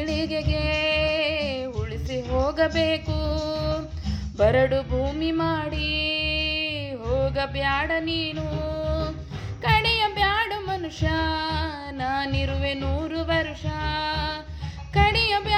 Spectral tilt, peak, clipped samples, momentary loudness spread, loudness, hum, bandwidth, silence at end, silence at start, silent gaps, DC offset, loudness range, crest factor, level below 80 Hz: -6 dB/octave; -6 dBFS; under 0.1%; 9 LU; -25 LUFS; none; 14.5 kHz; 0 s; 0 s; none; under 0.1%; 2 LU; 20 dB; -36 dBFS